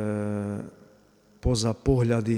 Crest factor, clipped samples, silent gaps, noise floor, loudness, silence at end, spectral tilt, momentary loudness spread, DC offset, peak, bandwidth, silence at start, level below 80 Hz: 18 dB; under 0.1%; none; -58 dBFS; -27 LUFS; 0 s; -6.5 dB/octave; 12 LU; under 0.1%; -8 dBFS; 12 kHz; 0 s; -40 dBFS